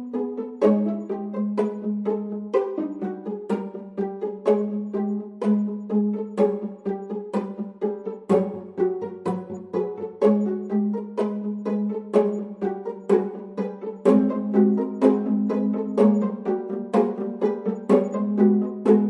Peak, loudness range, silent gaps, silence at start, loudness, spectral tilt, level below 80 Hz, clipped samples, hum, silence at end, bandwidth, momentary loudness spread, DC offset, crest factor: -6 dBFS; 5 LU; none; 0 s; -24 LUFS; -9.5 dB/octave; -72 dBFS; under 0.1%; none; 0 s; 5.4 kHz; 10 LU; under 0.1%; 18 dB